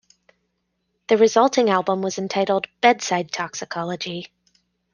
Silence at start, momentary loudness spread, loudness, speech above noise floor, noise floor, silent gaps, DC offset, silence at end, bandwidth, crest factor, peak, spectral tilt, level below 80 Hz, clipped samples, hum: 1.1 s; 12 LU; -20 LUFS; 53 dB; -73 dBFS; none; under 0.1%; 0.7 s; 10 kHz; 20 dB; -2 dBFS; -4 dB/octave; -68 dBFS; under 0.1%; 60 Hz at -55 dBFS